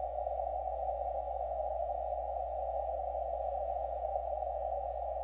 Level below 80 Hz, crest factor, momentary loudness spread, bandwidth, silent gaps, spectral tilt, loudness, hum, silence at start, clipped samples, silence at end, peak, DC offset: -48 dBFS; 14 dB; 1 LU; 4 kHz; none; -7 dB/octave; -37 LUFS; none; 0 s; under 0.1%; 0 s; -22 dBFS; under 0.1%